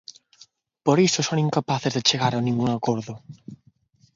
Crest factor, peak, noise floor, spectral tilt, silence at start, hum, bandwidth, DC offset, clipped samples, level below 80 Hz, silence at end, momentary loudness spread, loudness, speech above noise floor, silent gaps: 22 dB; -2 dBFS; -60 dBFS; -4.5 dB/octave; 0.85 s; none; 7.8 kHz; under 0.1%; under 0.1%; -62 dBFS; 0.6 s; 19 LU; -22 LUFS; 37 dB; none